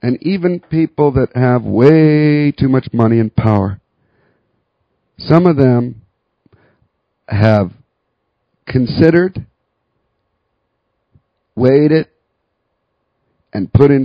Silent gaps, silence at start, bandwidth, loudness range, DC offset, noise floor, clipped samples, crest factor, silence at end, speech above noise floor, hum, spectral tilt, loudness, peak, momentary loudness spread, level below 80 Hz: none; 0.05 s; 6 kHz; 6 LU; under 0.1%; -69 dBFS; 0.3%; 14 dB; 0 s; 58 dB; none; -10 dB/octave; -13 LUFS; 0 dBFS; 14 LU; -38 dBFS